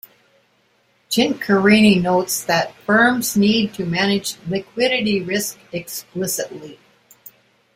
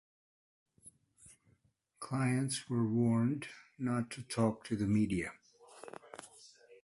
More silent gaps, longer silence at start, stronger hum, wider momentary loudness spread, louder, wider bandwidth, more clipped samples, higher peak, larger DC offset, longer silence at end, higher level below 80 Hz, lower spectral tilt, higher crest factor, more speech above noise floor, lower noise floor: neither; first, 1.1 s vs 0.85 s; neither; second, 13 LU vs 20 LU; first, -18 LUFS vs -35 LUFS; first, 16 kHz vs 11.5 kHz; neither; first, -2 dBFS vs -18 dBFS; neither; first, 1 s vs 0.1 s; first, -56 dBFS vs -64 dBFS; second, -4 dB/octave vs -6 dB/octave; about the same, 18 dB vs 20 dB; about the same, 43 dB vs 40 dB; second, -61 dBFS vs -74 dBFS